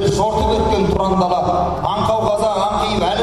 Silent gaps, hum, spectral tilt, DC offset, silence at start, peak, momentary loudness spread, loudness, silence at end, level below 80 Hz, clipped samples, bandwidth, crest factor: none; none; -6 dB/octave; under 0.1%; 0 s; -4 dBFS; 2 LU; -17 LUFS; 0 s; -30 dBFS; under 0.1%; 14 kHz; 12 dB